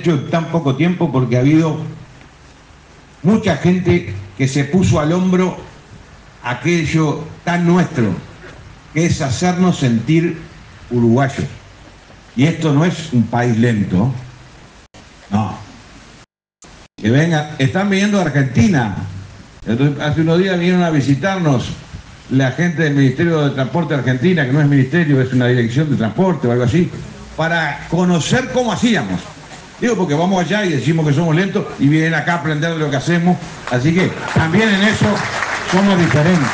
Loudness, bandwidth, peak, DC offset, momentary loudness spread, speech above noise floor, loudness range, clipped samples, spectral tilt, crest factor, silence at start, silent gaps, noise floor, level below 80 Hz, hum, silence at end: -15 LUFS; 9.4 kHz; 0 dBFS; under 0.1%; 10 LU; 32 dB; 3 LU; under 0.1%; -6.5 dB/octave; 16 dB; 0 s; none; -47 dBFS; -46 dBFS; none; 0 s